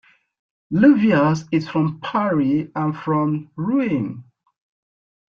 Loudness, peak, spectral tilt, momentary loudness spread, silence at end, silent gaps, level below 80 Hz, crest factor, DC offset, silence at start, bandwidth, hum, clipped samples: -20 LUFS; -2 dBFS; -8 dB/octave; 10 LU; 1.05 s; none; -60 dBFS; 18 dB; under 0.1%; 0.7 s; 7 kHz; none; under 0.1%